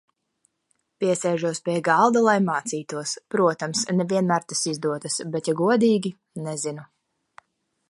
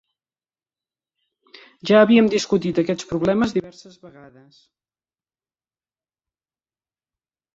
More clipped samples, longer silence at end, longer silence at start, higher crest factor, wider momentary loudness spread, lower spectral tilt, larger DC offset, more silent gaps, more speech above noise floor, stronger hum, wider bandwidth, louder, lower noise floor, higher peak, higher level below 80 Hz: neither; second, 1.05 s vs 3.5 s; second, 1 s vs 1.85 s; about the same, 20 dB vs 22 dB; about the same, 11 LU vs 10 LU; about the same, -4.5 dB/octave vs -5.5 dB/octave; neither; neither; second, 50 dB vs over 71 dB; neither; first, 11.5 kHz vs 7.8 kHz; second, -23 LUFS vs -18 LUFS; second, -72 dBFS vs under -90 dBFS; about the same, -4 dBFS vs -2 dBFS; second, -72 dBFS vs -58 dBFS